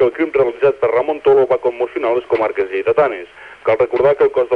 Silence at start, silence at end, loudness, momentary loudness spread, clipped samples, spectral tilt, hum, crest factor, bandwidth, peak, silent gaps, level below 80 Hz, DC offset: 0 s; 0 s; -16 LUFS; 6 LU; under 0.1%; -7.5 dB/octave; none; 14 dB; 5 kHz; -2 dBFS; none; -52 dBFS; under 0.1%